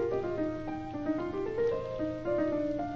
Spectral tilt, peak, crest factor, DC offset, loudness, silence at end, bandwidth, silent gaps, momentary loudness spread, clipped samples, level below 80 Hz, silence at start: -8 dB/octave; -20 dBFS; 12 dB; under 0.1%; -33 LUFS; 0 s; 7.2 kHz; none; 5 LU; under 0.1%; -52 dBFS; 0 s